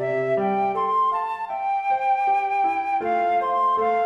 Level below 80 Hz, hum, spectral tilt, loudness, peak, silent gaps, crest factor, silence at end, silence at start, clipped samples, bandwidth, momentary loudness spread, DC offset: -66 dBFS; none; -7 dB/octave; -22 LUFS; -12 dBFS; none; 10 dB; 0 s; 0 s; under 0.1%; 7.6 kHz; 4 LU; under 0.1%